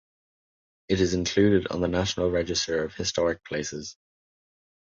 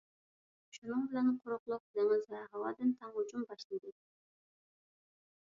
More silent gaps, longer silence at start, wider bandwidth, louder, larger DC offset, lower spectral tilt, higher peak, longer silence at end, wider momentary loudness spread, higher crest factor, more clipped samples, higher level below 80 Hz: second, none vs 0.78-0.82 s, 1.59-1.66 s, 1.80-1.94 s, 3.64-3.70 s; first, 0.9 s vs 0.75 s; about the same, 7.8 kHz vs 7.2 kHz; first, -26 LUFS vs -38 LUFS; neither; about the same, -4.5 dB/octave vs -4.5 dB/octave; first, -8 dBFS vs -22 dBFS; second, 0.95 s vs 1.6 s; about the same, 10 LU vs 12 LU; about the same, 20 dB vs 16 dB; neither; first, -46 dBFS vs -86 dBFS